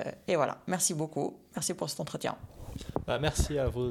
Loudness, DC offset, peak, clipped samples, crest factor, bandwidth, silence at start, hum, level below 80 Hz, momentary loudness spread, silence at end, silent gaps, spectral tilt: -32 LUFS; under 0.1%; -14 dBFS; under 0.1%; 20 dB; 18.5 kHz; 0 s; none; -44 dBFS; 9 LU; 0 s; none; -4 dB/octave